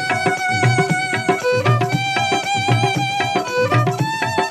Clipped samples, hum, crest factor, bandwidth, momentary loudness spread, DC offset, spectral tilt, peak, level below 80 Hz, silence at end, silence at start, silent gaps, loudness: under 0.1%; none; 16 dB; 13.5 kHz; 3 LU; under 0.1%; -5 dB/octave; -2 dBFS; -56 dBFS; 0 s; 0 s; none; -18 LUFS